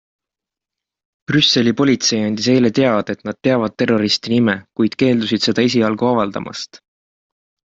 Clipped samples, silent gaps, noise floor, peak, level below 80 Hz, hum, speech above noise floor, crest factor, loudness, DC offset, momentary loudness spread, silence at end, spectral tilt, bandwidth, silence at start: under 0.1%; none; -86 dBFS; -2 dBFS; -56 dBFS; none; 70 dB; 16 dB; -16 LUFS; under 0.1%; 8 LU; 1 s; -4.5 dB/octave; 7.8 kHz; 1.3 s